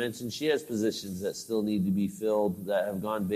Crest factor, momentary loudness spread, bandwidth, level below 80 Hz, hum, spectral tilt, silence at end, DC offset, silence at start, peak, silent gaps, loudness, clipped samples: 14 dB; 5 LU; 14.5 kHz; -68 dBFS; none; -5.5 dB/octave; 0 s; under 0.1%; 0 s; -16 dBFS; none; -30 LUFS; under 0.1%